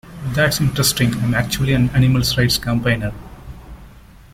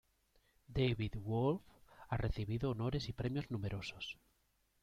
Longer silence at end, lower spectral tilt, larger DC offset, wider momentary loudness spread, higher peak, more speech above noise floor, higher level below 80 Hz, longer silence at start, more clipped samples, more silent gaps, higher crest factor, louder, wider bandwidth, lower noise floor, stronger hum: second, 0.45 s vs 0.7 s; second, -4.5 dB/octave vs -7.5 dB/octave; neither; first, 18 LU vs 8 LU; first, -4 dBFS vs -22 dBFS; second, 25 dB vs 39 dB; first, -36 dBFS vs -52 dBFS; second, 0.05 s vs 0.7 s; neither; neither; about the same, 16 dB vs 18 dB; first, -17 LUFS vs -40 LUFS; first, 16.5 kHz vs 13.5 kHz; second, -42 dBFS vs -78 dBFS; neither